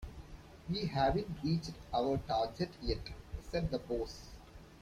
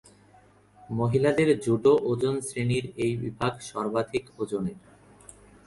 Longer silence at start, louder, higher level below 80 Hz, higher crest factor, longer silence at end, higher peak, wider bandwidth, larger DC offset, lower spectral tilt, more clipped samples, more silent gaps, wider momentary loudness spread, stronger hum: second, 0 s vs 0.9 s; second, -37 LUFS vs -27 LUFS; first, -50 dBFS vs -58 dBFS; about the same, 18 dB vs 18 dB; second, 0 s vs 0.9 s; second, -20 dBFS vs -10 dBFS; first, 14.5 kHz vs 11.5 kHz; neither; about the same, -6.5 dB/octave vs -6.5 dB/octave; neither; neither; first, 19 LU vs 10 LU; neither